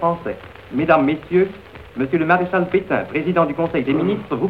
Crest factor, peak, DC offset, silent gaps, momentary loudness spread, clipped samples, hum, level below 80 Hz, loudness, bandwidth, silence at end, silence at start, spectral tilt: 18 dB; 0 dBFS; 0.2%; none; 11 LU; under 0.1%; none; -48 dBFS; -19 LUFS; 5.2 kHz; 0 s; 0 s; -9 dB/octave